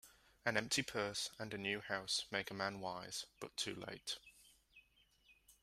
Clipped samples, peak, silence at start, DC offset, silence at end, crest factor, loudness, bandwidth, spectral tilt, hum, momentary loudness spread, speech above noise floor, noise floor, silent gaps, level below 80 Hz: under 0.1%; -20 dBFS; 0.05 s; under 0.1%; 0.1 s; 26 dB; -42 LUFS; 15.5 kHz; -2.5 dB/octave; none; 9 LU; 30 dB; -73 dBFS; none; -74 dBFS